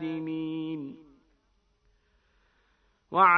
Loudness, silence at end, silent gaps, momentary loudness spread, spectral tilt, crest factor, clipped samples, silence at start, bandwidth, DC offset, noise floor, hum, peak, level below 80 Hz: -31 LUFS; 0 s; none; 16 LU; -8 dB/octave; 22 dB; under 0.1%; 0 s; 5.2 kHz; under 0.1%; -70 dBFS; none; -8 dBFS; -70 dBFS